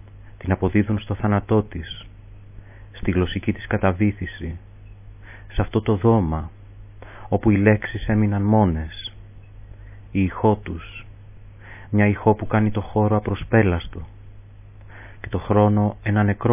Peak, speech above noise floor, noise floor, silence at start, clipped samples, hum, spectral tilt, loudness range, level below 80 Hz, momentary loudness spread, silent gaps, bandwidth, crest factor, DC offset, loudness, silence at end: -2 dBFS; 23 dB; -43 dBFS; 0.15 s; under 0.1%; none; -12 dB/octave; 4 LU; -36 dBFS; 20 LU; none; 3.7 kHz; 20 dB; 0.1%; -21 LUFS; 0 s